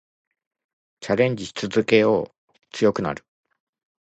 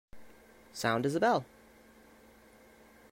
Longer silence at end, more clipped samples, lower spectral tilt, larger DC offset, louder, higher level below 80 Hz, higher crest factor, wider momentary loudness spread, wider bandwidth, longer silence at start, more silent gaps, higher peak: second, 0.85 s vs 1.65 s; neither; about the same, -5.5 dB/octave vs -5 dB/octave; neither; first, -22 LUFS vs -31 LUFS; first, -58 dBFS vs -66 dBFS; about the same, 20 dB vs 20 dB; about the same, 19 LU vs 19 LU; second, 8.4 kHz vs 16 kHz; first, 1 s vs 0.15 s; first, 2.38-2.48 s vs none; first, -4 dBFS vs -16 dBFS